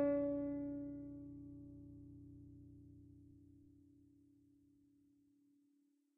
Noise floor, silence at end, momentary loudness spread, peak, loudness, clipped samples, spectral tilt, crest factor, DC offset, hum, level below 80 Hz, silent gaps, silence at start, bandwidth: -78 dBFS; 2.25 s; 25 LU; -28 dBFS; -45 LUFS; under 0.1%; -7.5 dB/octave; 20 dB; under 0.1%; none; -72 dBFS; none; 0 s; 2.8 kHz